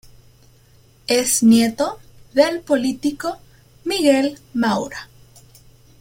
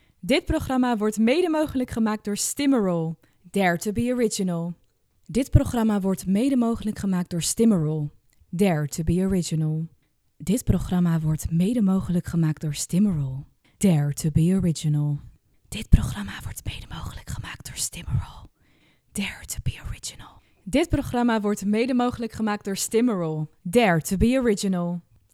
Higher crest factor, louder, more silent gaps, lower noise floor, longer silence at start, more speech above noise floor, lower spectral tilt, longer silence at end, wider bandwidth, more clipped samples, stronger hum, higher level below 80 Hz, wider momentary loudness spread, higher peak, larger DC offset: about the same, 18 dB vs 22 dB; first, -18 LUFS vs -24 LUFS; neither; second, -51 dBFS vs -61 dBFS; first, 1.1 s vs 0.25 s; second, 34 dB vs 38 dB; second, -3.5 dB/octave vs -6 dB/octave; first, 0.95 s vs 0.35 s; about the same, 16.5 kHz vs 16 kHz; neither; neither; second, -54 dBFS vs -36 dBFS; first, 17 LU vs 14 LU; about the same, -2 dBFS vs -2 dBFS; neither